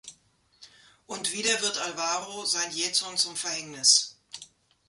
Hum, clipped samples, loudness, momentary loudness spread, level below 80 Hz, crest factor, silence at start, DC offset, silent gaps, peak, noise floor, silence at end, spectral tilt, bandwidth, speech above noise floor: none; under 0.1%; -25 LUFS; 19 LU; -74 dBFS; 24 dB; 0.05 s; under 0.1%; none; -6 dBFS; -64 dBFS; 0.45 s; 0.5 dB/octave; 12 kHz; 36 dB